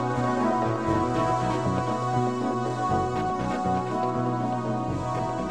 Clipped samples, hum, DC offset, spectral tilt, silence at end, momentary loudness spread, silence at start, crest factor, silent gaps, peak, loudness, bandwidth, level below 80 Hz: under 0.1%; none; 0.4%; -7 dB/octave; 0 s; 4 LU; 0 s; 14 dB; none; -12 dBFS; -26 LUFS; 10.5 kHz; -48 dBFS